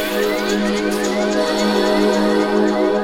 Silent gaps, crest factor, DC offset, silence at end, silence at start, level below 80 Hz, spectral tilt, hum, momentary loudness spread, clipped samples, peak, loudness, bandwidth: none; 12 dB; under 0.1%; 0 s; 0 s; -44 dBFS; -4.5 dB/octave; none; 3 LU; under 0.1%; -4 dBFS; -17 LUFS; 17 kHz